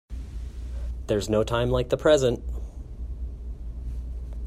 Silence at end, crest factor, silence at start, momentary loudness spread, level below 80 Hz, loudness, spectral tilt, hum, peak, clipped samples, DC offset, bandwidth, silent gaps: 0 s; 20 dB; 0.1 s; 17 LU; -34 dBFS; -26 LUFS; -6 dB/octave; none; -8 dBFS; under 0.1%; under 0.1%; 14 kHz; none